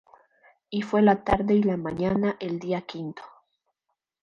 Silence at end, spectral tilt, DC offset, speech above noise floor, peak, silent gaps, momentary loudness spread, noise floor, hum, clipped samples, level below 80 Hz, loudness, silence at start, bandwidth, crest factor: 0.95 s; -8 dB/octave; under 0.1%; 57 dB; -8 dBFS; none; 15 LU; -81 dBFS; none; under 0.1%; -48 dBFS; -25 LUFS; 0.7 s; 7.2 kHz; 18 dB